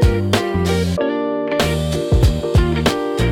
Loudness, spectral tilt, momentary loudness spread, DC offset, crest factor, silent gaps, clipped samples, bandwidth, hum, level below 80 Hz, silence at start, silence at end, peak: -18 LUFS; -6 dB/octave; 4 LU; under 0.1%; 14 dB; none; under 0.1%; 17.5 kHz; none; -24 dBFS; 0 s; 0 s; -2 dBFS